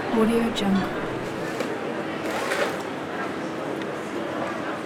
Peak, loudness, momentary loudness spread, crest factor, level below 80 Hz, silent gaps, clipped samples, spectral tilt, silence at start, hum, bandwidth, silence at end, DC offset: -8 dBFS; -27 LUFS; 8 LU; 18 dB; -52 dBFS; none; under 0.1%; -5.5 dB/octave; 0 s; none; 17 kHz; 0 s; under 0.1%